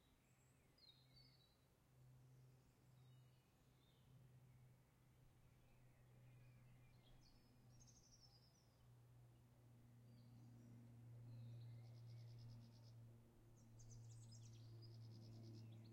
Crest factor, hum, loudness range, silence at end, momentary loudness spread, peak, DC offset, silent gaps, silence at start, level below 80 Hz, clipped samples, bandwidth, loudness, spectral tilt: 14 dB; none; 5 LU; 0 s; 9 LU; -50 dBFS; under 0.1%; none; 0 s; -80 dBFS; under 0.1%; 16 kHz; -64 LUFS; -5.5 dB/octave